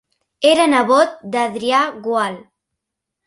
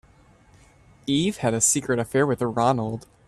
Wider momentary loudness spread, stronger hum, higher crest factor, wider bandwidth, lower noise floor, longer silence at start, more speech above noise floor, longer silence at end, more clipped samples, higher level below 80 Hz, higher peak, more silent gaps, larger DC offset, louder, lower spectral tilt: about the same, 8 LU vs 7 LU; neither; about the same, 16 dB vs 18 dB; second, 11.5 kHz vs 14 kHz; first, -80 dBFS vs -55 dBFS; second, 0.4 s vs 1.05 s; first, 65 dB vs 32 dB; first, 0.85 s vs 0.25 s; neither; second, -64 dBFS vs -56 dBFS; first, 0 dBFS vs -6 dBFS; neither; neither; first, -16 LUFS vs -23 LUFS; about the same, -3.5 dB/octave vs -4 dB/octave